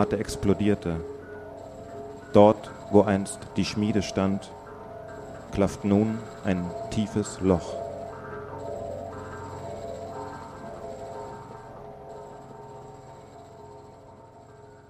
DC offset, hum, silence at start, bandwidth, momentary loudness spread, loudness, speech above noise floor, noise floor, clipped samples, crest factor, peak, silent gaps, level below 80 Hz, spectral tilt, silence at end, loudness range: under 0.1%; none; 0 s; 13 kHz; 21 LU; -27 LUFS; 25 dB; -49 dBFS; under 0.1%; 26 dB; -2 dBFS; none; -52 dBFS; -6.5 dB/octave; 0.05 s; 17 LU